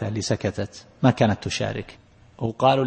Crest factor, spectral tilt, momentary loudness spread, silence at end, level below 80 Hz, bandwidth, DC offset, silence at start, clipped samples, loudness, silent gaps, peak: 20 dB; -6 dB/octave; 14 LU; 0 s; -50 dBFS; 8.8 kHz; under 0.1%; 0 s; under 0.1%; -24 LUFS; none; -4 dBFS